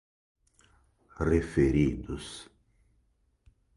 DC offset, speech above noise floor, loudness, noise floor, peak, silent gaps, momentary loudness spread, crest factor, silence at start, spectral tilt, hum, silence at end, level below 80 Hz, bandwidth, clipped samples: under 0.1%; 43 dB; -28 LUFS; -71 dBFS; -12 dBFS; none; 16 LU; 20 dB; 1.2 s; -7.5 dB/octave; none; 1.35 s; -42 dBFS; 11.5 kHz; under 0.1%